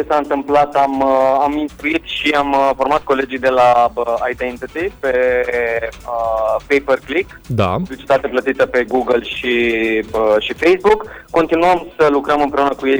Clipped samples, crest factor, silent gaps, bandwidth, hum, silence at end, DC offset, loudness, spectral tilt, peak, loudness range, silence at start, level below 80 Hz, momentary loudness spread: under 0.1%; 14 dB; none; over 20 kHz; none; 0 s; under 0.1%; -16 LUFS; -5.5 dB/octave; -2 dBFS; 3 LU; 0 s; -42 dBFS; 7 LU